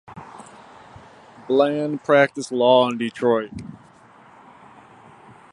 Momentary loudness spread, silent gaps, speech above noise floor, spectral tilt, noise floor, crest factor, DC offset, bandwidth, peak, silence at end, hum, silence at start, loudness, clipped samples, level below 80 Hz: 24 LU; none; 30 dB; -5.5 dB/octave; -49 dBFS; 22 dB; under 0.1%; 11 kHz; -2 dBFS; 1.8 s; none; 0.1 s; -19 LUFS; under 0.1%; -60 dBFS